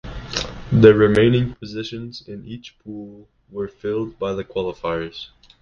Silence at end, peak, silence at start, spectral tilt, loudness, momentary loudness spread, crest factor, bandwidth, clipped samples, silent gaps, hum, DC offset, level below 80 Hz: 0.35 s; 0 dBFS; 0.05 s; -7 dB/octave; -19 LUFS; 23 LU; 20 dB; 7.4 kHz; under 0.1%; none; none; under 0.1%; -42 dBFS